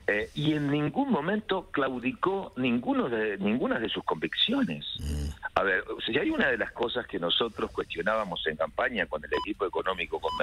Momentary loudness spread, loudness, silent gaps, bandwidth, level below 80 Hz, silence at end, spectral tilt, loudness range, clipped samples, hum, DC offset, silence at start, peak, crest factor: 5 LU; -29 LUFS; none; 13.5 kHz; -48 dBFS; 0 s; -6 dB/octave; 1 LU; under 0.1%; none; under 0.1%; 0 s; -10 dBFS; 20 dB